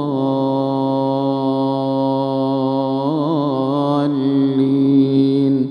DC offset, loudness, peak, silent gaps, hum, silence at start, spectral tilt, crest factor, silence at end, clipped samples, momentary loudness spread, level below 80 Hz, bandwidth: under 0.1%; -17 LUFS; -4 dBFS; none; none; 0 s; -9.5 dB/octave; 12 dB; 0 s; under 0.1%; 5 LU; -68 dBFS; 5.4 kHz